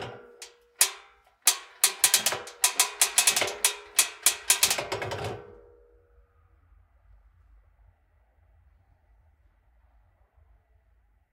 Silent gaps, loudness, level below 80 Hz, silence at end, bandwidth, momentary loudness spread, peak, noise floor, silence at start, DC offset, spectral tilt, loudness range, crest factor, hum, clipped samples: none; -24 LUFS; -62 dBFS; 5.8 s; 17 kHz; 22 LU; -2 dBFS; -65 dBFS; 0 s; under 0.1%; 1 dB/octave; 13 LU; 28 dB; none; under 0.1%